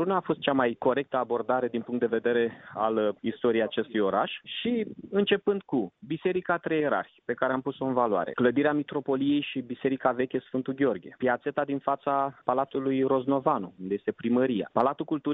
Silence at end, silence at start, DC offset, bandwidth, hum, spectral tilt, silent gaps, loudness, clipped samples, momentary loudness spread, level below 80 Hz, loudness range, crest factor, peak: 0 s; 0 s; under 0.1%; 4 kHz; none; -4 dB/octave; none; -28 LUFS; under 0.1%; 6 LU; -68 dBFS; 1 LU; 20 dB; -8 dBFS